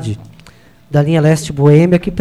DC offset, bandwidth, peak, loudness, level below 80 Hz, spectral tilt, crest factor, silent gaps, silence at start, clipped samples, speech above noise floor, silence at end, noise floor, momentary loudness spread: under 0.1%; 12.5 kHz; 0 dBFS; -12 LUFS; -40 dBFS; -7.5 dB/octave; 12 dB; none; 0 s; under 0.1%; 32 dB; 0 s; -43 dBFS; 13 LU